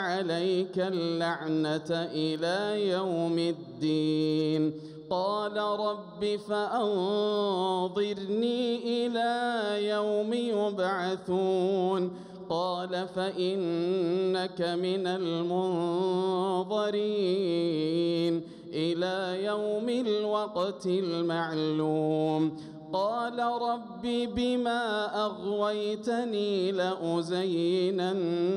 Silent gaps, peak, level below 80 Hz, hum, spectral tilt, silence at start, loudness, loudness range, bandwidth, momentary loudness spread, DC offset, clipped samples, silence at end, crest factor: none; -16 dBFS; -68 dBFS; none; -6.5 dB/octave; 0 s; -29 LUFS; 1 LU; 11 kHz; 4 LU; under 0.1%; under 0.1%; 0 s; 12 dB